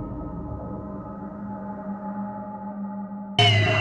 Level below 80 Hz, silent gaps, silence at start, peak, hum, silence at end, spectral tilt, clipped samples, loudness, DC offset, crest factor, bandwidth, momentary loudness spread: -46 dBFS; none; 0 s; -6 dBFS; none; 0 s; -5.5 dB/octave; under 0.1%; -27 LUFS; under 0.1%; 20 dB; 9.6 kHz; 17 LU